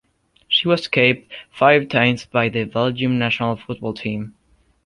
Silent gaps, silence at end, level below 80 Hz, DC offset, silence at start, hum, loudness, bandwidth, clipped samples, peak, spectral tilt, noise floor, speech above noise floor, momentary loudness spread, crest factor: none; 0.55 s; -54 dBFS; under 0.1%; 0.5 s; none; -19 LUFS; 11 kHz; under 0.1%; -2 dBFS; -6 dB/octave; -44 dBFS; 25 dB; 12 LU; 18 dB